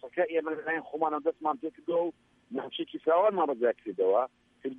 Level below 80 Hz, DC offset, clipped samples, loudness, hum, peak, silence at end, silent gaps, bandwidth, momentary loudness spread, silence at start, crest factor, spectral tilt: -80 dBFS; under 0.1%; under 0.1%; -30 LUFS; none; -14 dBFS; 0 s; none; 3.8 kHz; 11 LU; 0.05 s; 16 dB; -7 dB/octave